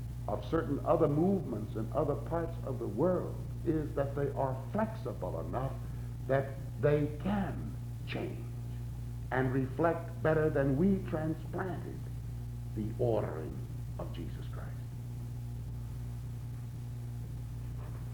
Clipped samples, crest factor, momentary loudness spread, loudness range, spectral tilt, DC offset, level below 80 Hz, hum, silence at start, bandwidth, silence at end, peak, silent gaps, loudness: under 0.1%; 20 dB; 12 LU; 9 LU; -8.5 dB/octave; under 0.1%; -46 dBFS; none; 0 s; over 20 kHz; 0 s; -14 dBFS; none; -35 LUFS